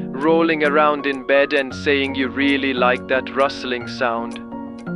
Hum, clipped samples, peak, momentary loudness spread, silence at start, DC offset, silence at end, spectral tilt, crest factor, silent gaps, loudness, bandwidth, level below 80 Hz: none; under 0.1%; -2 dBFS; 10 LU; 0 s; under 0.1%; 0 s; -5.5 dB/octave; 18 dB; none; -18 LUFS; 11 kHz; -54 dBFS